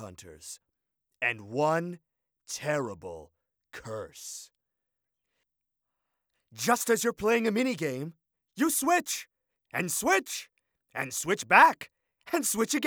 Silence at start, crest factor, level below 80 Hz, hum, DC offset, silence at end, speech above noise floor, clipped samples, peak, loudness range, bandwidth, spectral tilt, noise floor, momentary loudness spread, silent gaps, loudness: 0 s; 26 dB; -68 dBFS; none; under 0.1%; 0 s; 58 dB; under 0.1%; -4 dBFS; 13 LU; over 20 kHz; -3 dB/octave; -86 dBFS; 21 LU; none; -27 LUFS